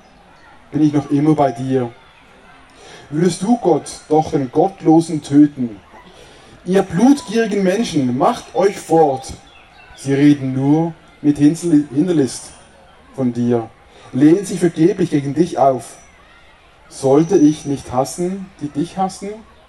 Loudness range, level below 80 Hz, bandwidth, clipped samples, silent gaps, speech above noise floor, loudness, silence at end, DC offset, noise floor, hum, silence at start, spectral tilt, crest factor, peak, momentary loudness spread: 3 LU; -52 dBFS; 12 kHz; under 0.1%; none; 31 dB; -16 LUFS; 0.25 s; under 0.1%; -46 dBFS; none; 0.7 s; -6.5 dB/octave; 16 dB; 0 dBFS; 13 LU